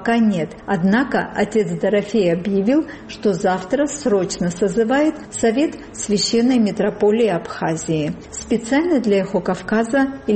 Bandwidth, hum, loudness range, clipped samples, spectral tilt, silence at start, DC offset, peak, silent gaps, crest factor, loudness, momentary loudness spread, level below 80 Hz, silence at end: 8.8 kHz; none; 1 LU; under 0.1%; -5 dB/octave; 0 s; under 0.1%; -6 dBFS; none; 12 dB; -19 LUFS; 6 LU; -48 dBFS; 0 s